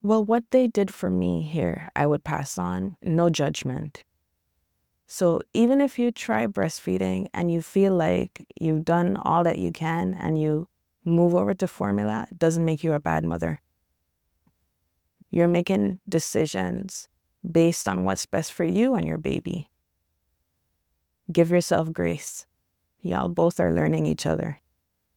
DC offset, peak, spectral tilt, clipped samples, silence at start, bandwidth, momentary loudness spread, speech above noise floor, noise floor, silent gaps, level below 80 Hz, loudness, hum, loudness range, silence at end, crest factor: under 0.1%; -6 dBFS; -6.5 dB/octave; under 0.1%; 0.05 s; 17.5 kHz; 10 LU; 51 dB; -75 dBFS; none; -54 dBFS; -24 LUFS; none; 4 LU; 0.6 s; 20 dB